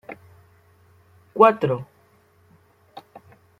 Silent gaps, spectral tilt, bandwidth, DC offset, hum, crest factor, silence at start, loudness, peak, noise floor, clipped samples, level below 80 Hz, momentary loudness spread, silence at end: none; -8 dB/octave; 14 kHz; under 0.1%; none; 24 dB; 0.1 s; -19 LUFS; -2 dBFS; -58 dBFS; under 0.1%; -66 dBFS; 29 LU; 1.75 s